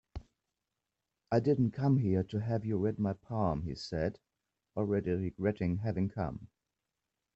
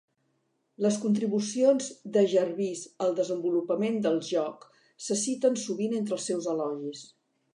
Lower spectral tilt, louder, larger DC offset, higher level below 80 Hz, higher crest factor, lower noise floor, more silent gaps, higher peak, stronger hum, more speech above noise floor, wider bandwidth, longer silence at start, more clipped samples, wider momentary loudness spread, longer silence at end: first, -9 dB/octave vs -5 dB/octave; second, -33 LUFS vs -28 LUFS; neither; first, -58 dBFS vs -82 dBFS; about the same, 18 dB vs 18 dB; first, -88 dBFS vs -75 dBFS; neither; second, -16 dBFS vs -10 dBFS; neither; first, 56 dB vs 47 dB; second, 8 kHz vs 11 kHz; second, 0.15 s vs 0.8 s; neither; about the same, 9 LU vs 9 LU; first, 0.9 s vs 0.5 s